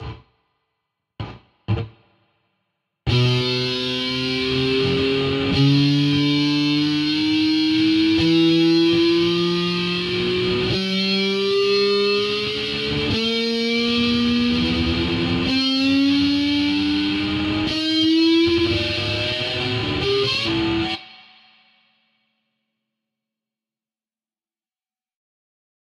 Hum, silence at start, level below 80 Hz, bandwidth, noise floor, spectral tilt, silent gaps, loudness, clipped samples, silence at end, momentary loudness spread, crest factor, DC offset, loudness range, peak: none; 0 s; -44 dBFS; 12 kHz; under -90 dBFS; -6 dB/octave; none; -19 LUFS; under 0.1%; 4.8 s; 6 LU; 14 dB; under 0.1%; 7 LU; -6 dBFS